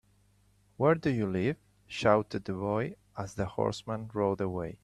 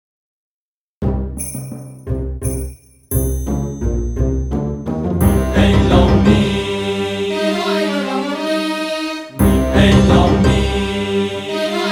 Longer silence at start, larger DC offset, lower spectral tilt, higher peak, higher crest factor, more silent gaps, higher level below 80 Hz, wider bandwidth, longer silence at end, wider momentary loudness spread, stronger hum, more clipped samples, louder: second, 0.8 s vs 1 s; neither; about the same, -7 dB/octave vs -6 dB/octave; second, -10 dBFS vs 0 dBFS; first, 22 dB vs 16 dB; neither; second, -60 dBFS vs -24 dBFS; second, 12.5 kHz vs 19.5 kHz; about the same, 0.1 s vs 0 s; about the same, 12 LU vs 12 LU; first, 50 Hz at -55 dBFS vs none; neither; second, -31 LUFS vs -16 LUFS